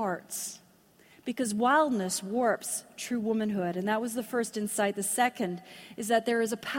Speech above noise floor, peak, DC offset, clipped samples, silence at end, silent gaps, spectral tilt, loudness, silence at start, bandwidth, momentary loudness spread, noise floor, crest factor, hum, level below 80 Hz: 31 dB; -12 dBFS; under 0.1%; under 0.1%; 0 s; none; -3.5 dB/octave; -30 LUFS; 0 s; 16.5 kHz; 13 LU; -61 dBFS; 18 dB; none; -74 dBFS